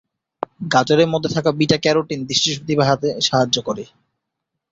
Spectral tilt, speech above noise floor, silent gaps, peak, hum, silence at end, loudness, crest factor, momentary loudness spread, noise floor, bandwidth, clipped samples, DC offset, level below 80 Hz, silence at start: -4.5 dB/octave; 61 dB; none; 0 dBFS; none; 0.85 s; -18 LUFS; 18 dB; 12 LU; -79 dBFS; 8 kHz; under 0.1%; under 0.1%; -54 dBFS; 0.6 s